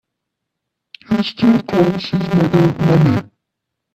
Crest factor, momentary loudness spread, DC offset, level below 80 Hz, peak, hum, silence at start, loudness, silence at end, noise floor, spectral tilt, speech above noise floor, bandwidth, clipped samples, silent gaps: 16 dB; 7 LU; under 0.1%; -48 dBFS; 0 dBFS; none; 1.1 s; -15 LUFS; 0.7 s; -78 dBFS; -8 dB/octave; 64 dB; 13 kHz; under 0.1%; none